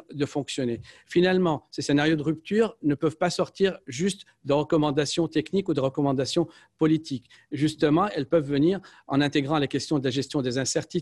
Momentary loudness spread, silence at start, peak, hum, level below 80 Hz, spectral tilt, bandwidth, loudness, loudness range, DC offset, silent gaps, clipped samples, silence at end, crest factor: 7 LU; 0.1 s; -10 dBFS; none; -60 dBFS; -5.5 dB/octave; 12 kHz; -25 LUFS; 1 LU; under 0.1%; none; under 0.1%; 0 s; 16 dB